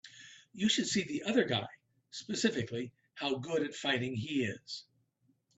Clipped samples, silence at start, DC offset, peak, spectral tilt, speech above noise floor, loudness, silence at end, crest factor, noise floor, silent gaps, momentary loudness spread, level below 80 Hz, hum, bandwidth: under 0.1%; 0.05 s; under 0.1%; -16 dBFS; -4 dB/octave; 41 dB; -34 LUFS; 0.75 s; 20 dB; -75 dBFS; none; 16 LU; -74 dBFS; none; 8.4 kHz